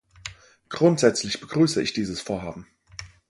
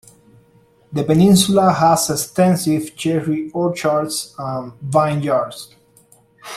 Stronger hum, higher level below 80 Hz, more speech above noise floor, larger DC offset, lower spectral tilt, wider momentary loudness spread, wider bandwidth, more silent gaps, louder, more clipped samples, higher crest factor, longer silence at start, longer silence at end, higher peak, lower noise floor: neither; about the same, -54 dBFS vs -52 dBFS; second, 21 dB vs 36 dB; neither; about the same, -5 dB/octave vs -5.5 dB/octave; first, 21 LU vs 14 LU; second, 11.5 kHz vs 15 kHz; neither; second, -23 LUFS vs -17 LUFS; neither; about the same, 22 dB vs 18 dB; second, 0.25 s vs 0.9 s; first, 0.25 s vs 0 s; about the same, -2 dBFS vs 0 dBFS; second, -44 dBFS vs -53 dBFS